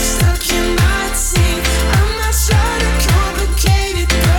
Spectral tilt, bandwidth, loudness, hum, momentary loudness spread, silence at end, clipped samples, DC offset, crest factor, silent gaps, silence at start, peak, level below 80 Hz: -4 dB/octave; 18.5 kHz; -14 LUFS; none; 2 LU; 0 s; under 0.1%; under 0.1%; 12 dB; none; 0 s; 0 dBFS; -16 dBFS